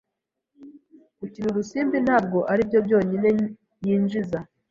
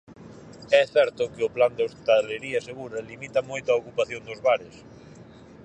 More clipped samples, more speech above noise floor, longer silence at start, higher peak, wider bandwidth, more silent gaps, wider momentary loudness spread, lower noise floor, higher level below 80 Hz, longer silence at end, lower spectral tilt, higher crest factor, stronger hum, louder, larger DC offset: neither; first, 61 dB vs 23 dB; first, 0.6 s vs 0.1 s; about the same, -6 dBFS vs -4 dBFS; second, 7.2 kHz vs 9 kHz; neither; second, 11 LU vs 14 LU; first, -83 dBFS vs -47 dBFS; about the same, -58 dBFS vs -62 dBFS; second, 0.25 s vs 0.4 s; first, -8 dB/octave vs -4 dB/octave; about the same, 18 dB vs 22 dB; neither; about the same, -23 LUFS vs -25 LUFS; neither